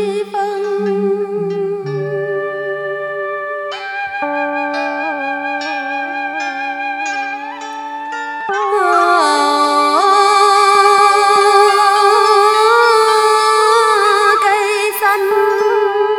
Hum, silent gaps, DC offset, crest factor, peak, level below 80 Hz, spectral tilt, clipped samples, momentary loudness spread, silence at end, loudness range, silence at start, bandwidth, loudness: none; none; under 0.1%; 14 dB; 0 dBFS; -62 dBFS; -3 dB/octave; under 0.1%; 12 LU; 0 s; 10 LU; 0 s; 18 kHz; -13 LUFS